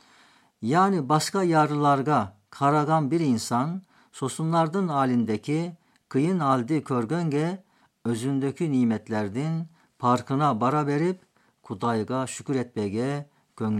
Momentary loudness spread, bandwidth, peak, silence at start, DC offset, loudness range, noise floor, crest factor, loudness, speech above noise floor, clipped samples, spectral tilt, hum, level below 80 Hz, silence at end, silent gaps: 11 LU; 14 kHz; -8 dBFS; 0.6 s; under 0.1%; 4 LU; -58 dBFS; 18 dB; -25 LUFS; 34 dB; under 0.1%; -6.5 dB/octave; none; -72 dBFS; 0 s; none